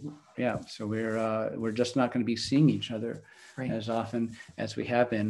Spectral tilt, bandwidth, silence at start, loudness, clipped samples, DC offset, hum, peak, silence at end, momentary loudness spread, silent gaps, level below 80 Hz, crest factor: -6 dB/octave; 11.5 kHz; 0 s; -30 LUFS; under 0.1%; under 0.1%; none; -10 dBFS; 0 s; 13 LU; none; -66 dBFS; 20 dB